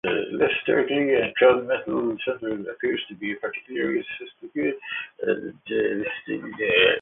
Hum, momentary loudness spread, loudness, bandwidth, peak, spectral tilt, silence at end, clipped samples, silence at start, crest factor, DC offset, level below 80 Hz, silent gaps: none; 12 LU; -24 LUFS; 3.9 kHz; -6 dBFS; -9 dB/octave; 0 s; under 0.1%; 0.05 s; 18 dB; under 0.1%; -62 dBFS; none